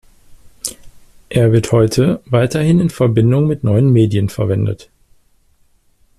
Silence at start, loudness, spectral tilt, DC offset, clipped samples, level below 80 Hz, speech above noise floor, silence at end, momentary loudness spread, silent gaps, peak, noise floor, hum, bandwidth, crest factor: 0.45 s; -14 LUFS; -7 dB/octave; under 0.1%; under 0.1%; -42 dBFS; 41 dB; 1.35 s; 14 LU; none; -2 dBFS; -54 dBFS; none; 13.5 kHz; 14 dB